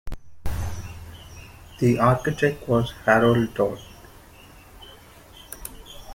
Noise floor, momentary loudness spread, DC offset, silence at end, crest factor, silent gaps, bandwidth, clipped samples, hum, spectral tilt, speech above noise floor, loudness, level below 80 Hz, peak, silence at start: -48 dBFS; 26 LU; under 0.1%; 0 s; 22 dB; none; 16.5 kHz; under 0.1%; none; -6.5 dB/octave; 27 dB; -22 LUFS; -42 dBFS; -2 dBFS; 0.05 s